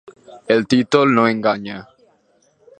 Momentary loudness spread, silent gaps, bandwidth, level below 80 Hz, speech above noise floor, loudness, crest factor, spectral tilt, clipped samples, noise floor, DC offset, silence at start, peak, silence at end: 14 LU; none; 9.2 kHz; -60 dBFS; 43 dB; -16 LUFS; 18 dB; -6 dB/octave; under 0.1%; -59 dBFS; under 0.1%; 0.3 s; 0 dBFS; 0.95 s